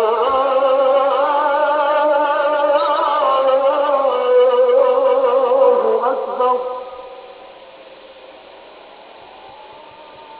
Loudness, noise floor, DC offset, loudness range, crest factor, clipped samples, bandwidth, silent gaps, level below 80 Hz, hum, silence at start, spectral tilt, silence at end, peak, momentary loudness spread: -15 LUFS; -40 dBFS; under 0.1%; 10 LU; 14 dB; under 0.1%; 4 kHz; none; -62 dBFS; none; 0 s; -6 dB/octave; 0 s; -2 dBFS; 7 LU